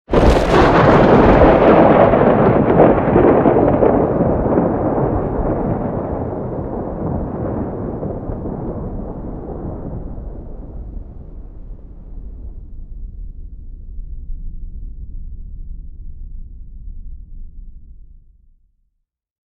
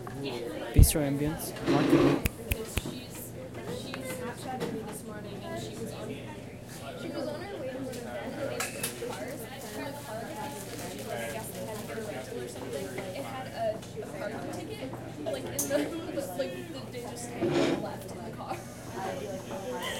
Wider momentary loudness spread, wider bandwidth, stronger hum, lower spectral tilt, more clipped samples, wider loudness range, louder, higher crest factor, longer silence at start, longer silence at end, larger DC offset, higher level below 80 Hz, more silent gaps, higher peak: first, 26 LU vs 12 LU; second, 10.5 kHz vs 16.5 kHz; neither; first, -8.5 dB/octave vs -5 dB/octave; neither; first, 25 LU vs 9 LU; first, -14 LUFS vs -33 LUFS; second, 16 dB vs 28 dB; about the same, 0.1 s vs 0 s; first, 1.4 s vs 0 s; neither; first, -28 dBFS vs -40 dBFS; neither; first, 0 dBFS vs -6 dBFS